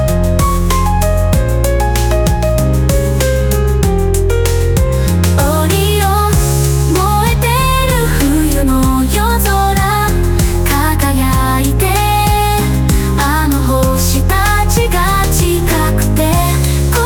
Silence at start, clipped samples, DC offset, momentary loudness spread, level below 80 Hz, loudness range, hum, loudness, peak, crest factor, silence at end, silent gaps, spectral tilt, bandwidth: 0 s; under 0.1%; under 0.1%; 2 LU; -16 dBFS; 1 LU; none; -12 LUFS; 0 dBFS; 10 dB; 0 s; none; -5 dB/octave; over 20 kHz